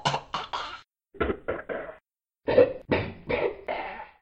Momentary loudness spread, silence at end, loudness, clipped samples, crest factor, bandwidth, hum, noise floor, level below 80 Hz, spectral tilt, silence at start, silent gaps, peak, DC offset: 15 LU; 0.15 s; -29 LUFS; under 0.1%; 22 dB; 8.6 kHz; none; -65 dBFS; -50 dBFS; -5.5 dB/octave; 0 s; none; -8 dBFS; under 0.1%